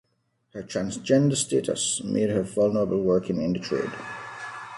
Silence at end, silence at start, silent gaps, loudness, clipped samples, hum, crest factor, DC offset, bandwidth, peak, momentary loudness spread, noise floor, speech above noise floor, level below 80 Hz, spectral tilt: 0 s; 0.55 s; none; -25 LUFS; under 0.1%; none; 18 dB; under 0.1%; 11.5 kHz; -8 dBFS; 14 LU; -72 dBFS; 47 dB; -58 dBFS; -5 dB/octave